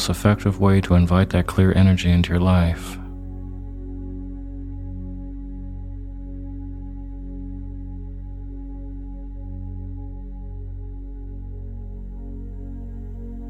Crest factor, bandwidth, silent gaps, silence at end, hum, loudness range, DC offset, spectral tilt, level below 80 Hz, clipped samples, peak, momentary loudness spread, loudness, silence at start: 22 dB; 14.5 kHz; none; 0 s; none; 17 LU; under 0.1%; -7 dB/octave; -32 dBFS; under 0.1%; 0 dBFS; 19 LU; -21 LUFS; 0 s